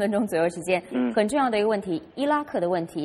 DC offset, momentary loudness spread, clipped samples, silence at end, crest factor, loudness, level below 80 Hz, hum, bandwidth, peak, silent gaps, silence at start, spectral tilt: under 0.1%; 5 LU; under 0.1%; 0 s; 16 dB; -25 LUFS; -62 dBFS; none; 14.5 kHz; -8 dBFS; none; 0 s; -5.5 dB/octave